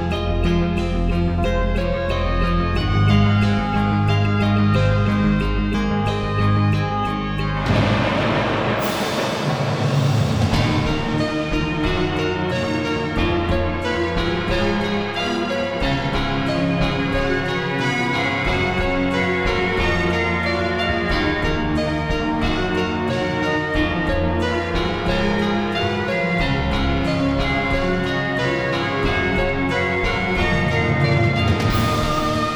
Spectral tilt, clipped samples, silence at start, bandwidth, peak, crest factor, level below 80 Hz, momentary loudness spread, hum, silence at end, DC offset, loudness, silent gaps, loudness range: -6.5 dB/octave; under 0.1%; 0 s; over 20 kHz; -4 dBFS; 14 dB; -28 dBFS; 4 LU; none; 0 s; under 0.1%; -20 LUFS; none; 2 LU